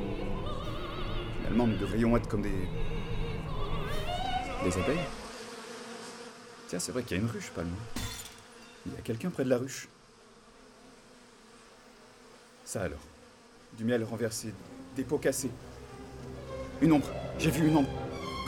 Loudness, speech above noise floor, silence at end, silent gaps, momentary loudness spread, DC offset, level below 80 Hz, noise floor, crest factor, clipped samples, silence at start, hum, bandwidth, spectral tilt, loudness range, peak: -33 LUFS; 27 dB; 0 s; none; 19 LU; under 0.1%; -42 dBFS; -57 dBFS; 20 dB; under 0.1%; 0 s; none; 18 kHz; -5.5 dB/octave; 7 LU; -12 dBFS